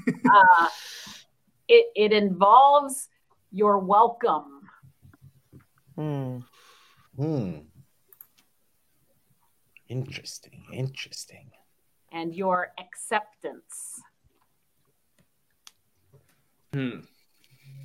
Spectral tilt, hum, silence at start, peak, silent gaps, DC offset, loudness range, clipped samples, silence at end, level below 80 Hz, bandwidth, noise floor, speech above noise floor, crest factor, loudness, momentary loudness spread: -4.5 dB/octave; none; 0.05 s; -4 dBFS; none; under 0.1%; 20 LU; under 0.1%; 0 s; -72 dBFS; 15.5 kHz; -72 dBFS; 49 dB; 22 dB; -22 LUFS; 25 LU